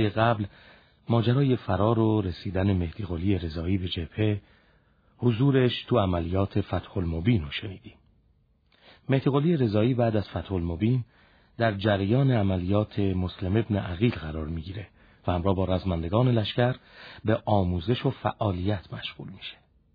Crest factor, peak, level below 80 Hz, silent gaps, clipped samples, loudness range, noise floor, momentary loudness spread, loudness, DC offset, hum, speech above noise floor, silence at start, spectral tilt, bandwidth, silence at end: 18 dB; -8 dBFS; -46 dBFS; none; under 0.1%; 3 LU; -65 dBFS; 13 LU; -27 LUFS; under 0.1%; none; 39 dB; 0 s; -10 dB/octave; 5 kHz; 0.4 s